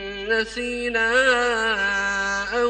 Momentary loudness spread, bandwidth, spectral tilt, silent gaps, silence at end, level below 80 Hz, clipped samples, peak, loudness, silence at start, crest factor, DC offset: 6 LU; 9.8 kHz; -2 dB/octave; none; 0 s; -46 dBFS; under 0.1%; -6 dBFS; -21 LUFS; 0 s; 16 dB; under 0.1%